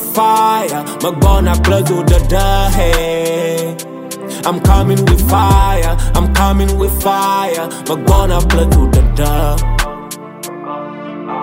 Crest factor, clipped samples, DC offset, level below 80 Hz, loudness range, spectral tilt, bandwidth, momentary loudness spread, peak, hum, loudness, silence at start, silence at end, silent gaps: 12 dB; under 0.1%; under 0.1%; -16 dBFS; 2 LU; -5.5 dB/octave; 16.5 kHz; 14 LU; 0 dBFS; none; -13 LUFS; 0 s; 0 s; none